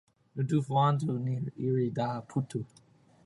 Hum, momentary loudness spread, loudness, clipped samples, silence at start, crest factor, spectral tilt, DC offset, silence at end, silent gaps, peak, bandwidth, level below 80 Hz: none; 12 LU; -31 LUFS; under 0.1%; 0.35 s; 18 dB; -8 dB/octave; under 0.1%; 0.6 s; none; -12 dBFS; 11.5 kHz; -68 dBFS